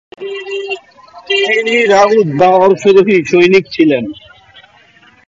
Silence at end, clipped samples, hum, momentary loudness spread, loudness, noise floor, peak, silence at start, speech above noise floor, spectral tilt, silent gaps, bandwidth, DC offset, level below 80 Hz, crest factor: 1.15 s; under 0.1%; none; 15 LU; -10 LUFS; -45 dBFS; 0 dBFS; 0.2 s; 36 dB; -5.5 dB/octave; none; 7.8 kHz; under 0.1%; -54 dBFS; 12 dB